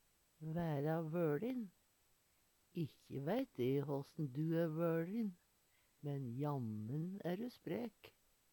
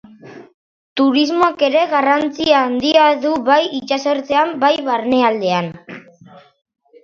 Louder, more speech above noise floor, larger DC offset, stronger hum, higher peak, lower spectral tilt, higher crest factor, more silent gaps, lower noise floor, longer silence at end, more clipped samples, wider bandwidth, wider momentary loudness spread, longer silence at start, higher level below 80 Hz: second, -43 LUFS vs -15 LUFS; first, 35 dB vs 29 dB; neither; neither; second, -26 dBFS vs 0 dBFS; first, -8.5 dB/octave vs -4.5 dB/octave; about the same, 16 dB vs 16 dB; second, none vs 0.54-0.96 s; first, -77 dBFS vs -44 dBFS; second, 0.45 s vs 0.65 s; neither; first, 19 kHz vs 7.4 kHz; about the same, 8 LU vs 7 LU; first, 0.4 s vs 0.25 s; second, -78 dBFS vs -58 dBFS